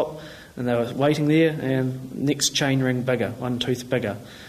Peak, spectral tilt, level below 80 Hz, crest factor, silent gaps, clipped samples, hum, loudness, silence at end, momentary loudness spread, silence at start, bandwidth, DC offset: -8 dBFS; -5 dB/octave; -56 dBFS; 16 dB; none; under 0.1%; none; -23 LUFS; 0 s; 10 LU; 0 s; 15 kHz; under 0.1%